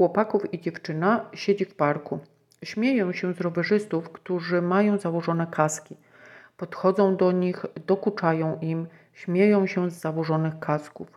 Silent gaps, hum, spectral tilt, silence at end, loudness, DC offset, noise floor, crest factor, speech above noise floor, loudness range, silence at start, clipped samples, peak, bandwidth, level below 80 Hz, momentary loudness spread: none; none; -6.5 dB/octave; 0.1 s; -25 LUFS; under 0.1%; -51 dBFS; 20 dB; 26 dB; 2 LU; 0 s; under 0.1%; -6 dBFS; 13 kHz; -72 dBFS; 11 LU